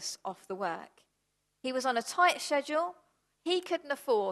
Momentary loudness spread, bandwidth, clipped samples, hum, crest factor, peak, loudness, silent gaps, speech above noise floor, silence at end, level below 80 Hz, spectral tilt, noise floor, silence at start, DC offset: 14 LU; 12.5 kHz; under 0.1%; none; 20 dB; -12 dBFS; -32 LUFS; none; 48 dB; 0 s; -84 dBFS; -2 dB/octave; -79 dBFS; 0 s; under 0.1%